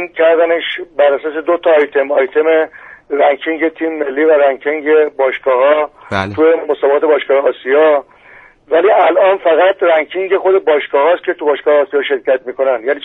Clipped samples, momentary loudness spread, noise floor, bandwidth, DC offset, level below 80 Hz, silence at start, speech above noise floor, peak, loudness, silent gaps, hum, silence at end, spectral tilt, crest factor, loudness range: under 0.1%; 6 LU; -42 dBFS; 6.2 kHz; under 0.1%; -58 dBFS; 0 s; 30 dB; 0 dBFS; -13 LUFS; none; none; 0 s; -6.5 dB/octave; 12 dB; 2 LU